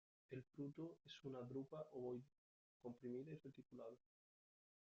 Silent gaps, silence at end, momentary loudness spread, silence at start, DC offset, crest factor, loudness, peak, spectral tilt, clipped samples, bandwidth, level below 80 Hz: 2.38-2.80 s; 0.9 s; 7 LU; 0.3 s; under 0.1%; 16 dB; -55 LUFS; -40 dBFS; -7 dB/octave; under 0.1%; 7.6 kHz; -90 dBFS